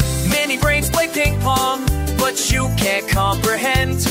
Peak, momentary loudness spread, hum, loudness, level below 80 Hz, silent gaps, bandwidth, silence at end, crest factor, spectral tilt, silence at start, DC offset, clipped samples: -4 dBFS; 2 LU; none; -17 LUFS; -26 dBFS; none; 16.5 kHz; 0 s; 14 dB; -4 dB/octave; 0 s; under 0.1%; under 0.1%